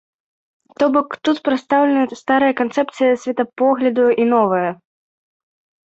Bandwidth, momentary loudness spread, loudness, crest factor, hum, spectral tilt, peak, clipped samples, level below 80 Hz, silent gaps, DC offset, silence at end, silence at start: 8 kHz; 5 LU; -17 LUFS; 16 dB; none; -6 dB/octave; -2 dBFS; under 0.1%; -62 dBFS; none; under 0.1%; 1.2 s; 0.8 s